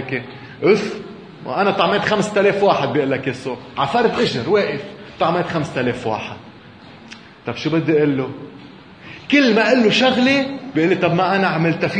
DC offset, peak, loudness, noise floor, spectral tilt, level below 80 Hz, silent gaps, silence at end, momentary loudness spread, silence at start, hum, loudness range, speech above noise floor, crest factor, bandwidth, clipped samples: under 0.1%; 0 dBFS; -18 LUFS; -41 dBFS; -5.5 dB/octave; -56 dBFS; none; 0 s; 20 LU; 0 s; none; 6 LU; 24 dB; 18 dB; 10 kHz; under 0.1%